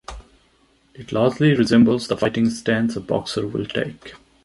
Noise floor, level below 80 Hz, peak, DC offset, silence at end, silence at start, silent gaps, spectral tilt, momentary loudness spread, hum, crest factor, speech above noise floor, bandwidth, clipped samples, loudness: -59 dBFS; -48 dBFS; -2 dBFS; under 0.1%; 0.3 s; 0.1 s; none; -6.5 dB/octave; 12 LU; none; 18 dB; 40 dB; 11.5 kHz; under 0.1%; -20 LUFS